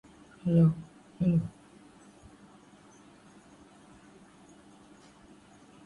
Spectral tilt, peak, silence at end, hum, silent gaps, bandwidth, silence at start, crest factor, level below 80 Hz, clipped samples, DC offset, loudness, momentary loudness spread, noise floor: -9.5 dB/octave; -14 dBFS; 4.35 s; none; none; 10.5 kHz; 0.45 s; 20 dB; -62 dBFS; under 0.1%; under 0.1%; -28 LUFS; 18 LU; -56 dBFS